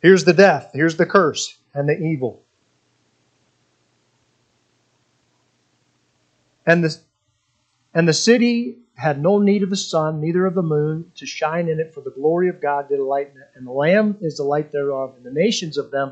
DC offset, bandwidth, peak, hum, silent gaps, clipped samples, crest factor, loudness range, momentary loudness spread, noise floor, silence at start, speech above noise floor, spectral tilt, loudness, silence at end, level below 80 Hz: under 0.1%; 9 kHz; 0 dBFS; none; none; under 0.1%; 20 dB; 8 LU; 12 LU; -68 dBFS; 0.05 s; 50 dB; -5.5 dB/octave; -19 LUFS; 0 s; -70 dBFS